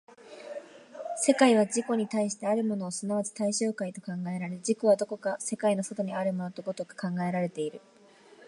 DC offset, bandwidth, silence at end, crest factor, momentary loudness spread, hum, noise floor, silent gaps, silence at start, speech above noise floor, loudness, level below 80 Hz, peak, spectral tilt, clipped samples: under 0.1%; 11.5 kHz; 0 s; 22 dB; 13 LU; none; -56 dBFS; none; 0.2 s; 28 dB; -29 LUFS; -80 dBFS; -8 dBFS; -5 dB/octave; under 0.1%